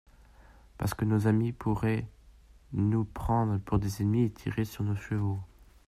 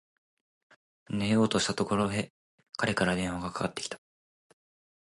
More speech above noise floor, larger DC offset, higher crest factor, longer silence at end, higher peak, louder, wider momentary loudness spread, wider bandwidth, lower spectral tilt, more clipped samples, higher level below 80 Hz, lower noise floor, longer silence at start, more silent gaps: second, 27 dB vs over 61 dB; neither; second, 16 dB vs 22 dB; second, 0.4 s vs 1.1 s; second, -14 dBFS vs -10 dBFS; about the same, -30 LUFS vs -30 LUFS; second, 8 LU vs 13 LU; first, 15 kHz vs 11.5 kHz; first, -8 dB/octave vs -4.5 dB/octave; neither; first, -48 dBFS vs -58 dBFS; second, -56 dBFS vs under -90 dBFS; second, 0.4 s vs 1.1 s; second, none vs 2.30-2.58 s